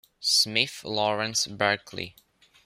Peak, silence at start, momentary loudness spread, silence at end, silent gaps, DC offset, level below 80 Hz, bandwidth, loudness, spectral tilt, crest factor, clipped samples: -6 dBFS; 0.2 s; 16 LU; 0.55 s; none; under 0.1%; -68 dBFS; 16 kHz; -24 LUFS; -1.5 dB/octave; 22 dB; under 0.1%